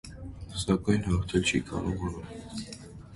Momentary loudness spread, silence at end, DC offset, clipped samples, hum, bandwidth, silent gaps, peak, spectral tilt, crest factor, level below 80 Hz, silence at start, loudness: 16 LU; 0 s; under 0.1%; under 0.1%; none; 11.5 kHz; none; -10 dBFS; -5.5 dB/octave; 20 dB; -42 dBFS; 0.05 s; -30 LUFS